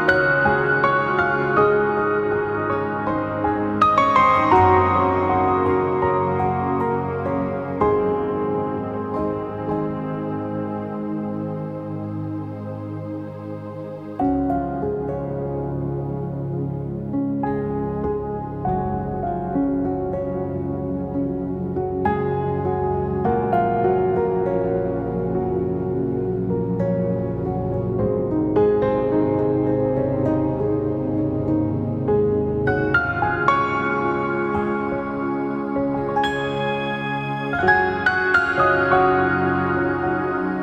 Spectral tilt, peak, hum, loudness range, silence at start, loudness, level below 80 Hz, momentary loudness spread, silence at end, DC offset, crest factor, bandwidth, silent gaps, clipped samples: -8.5 dB/octave; -4 dBFS; none; 8 LU; 0 s; -21 LUFS; -42 dBFS; 9 LU; 0 s; under 0.1%; 18 dB; 8 kHz; none; under 0.1%